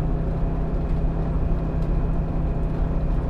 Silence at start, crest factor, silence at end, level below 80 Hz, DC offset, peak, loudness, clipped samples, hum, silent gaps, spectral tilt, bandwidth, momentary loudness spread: 0 s; 12 dB; 0 s; -24 dBFS; under 0.1%; -10 dBFS; -26 LUFS; under 0.1%; none; none; -10.5 dB/octave; 4.4 kHz; 1 LU